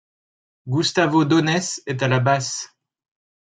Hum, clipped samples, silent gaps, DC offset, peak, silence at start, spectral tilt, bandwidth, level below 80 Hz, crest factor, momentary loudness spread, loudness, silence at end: none; under 0.1%; none; under 0.1%; -2 dBFS; 0.65 s; -5 dB/octave; 9.4 kHz; -64 dBFS; 20 dB; 10 LU; -20 LUFS; 0.75 s